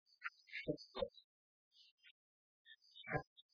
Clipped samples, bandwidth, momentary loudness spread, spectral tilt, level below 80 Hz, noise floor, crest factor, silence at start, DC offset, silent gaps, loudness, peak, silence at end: under 0.1%; 5.4 kHz; 22 LU; -3.5 dB/octave; -72 dBFS; under -90 dBFS; 24 dB; 0.2 s; under 0.1%; 1.24-1.71 s, 1.91-1.98 s, 2.11-2.65 s, 3.27-3.36 s; -48 LUFS; -26 dBFS; 0.1 s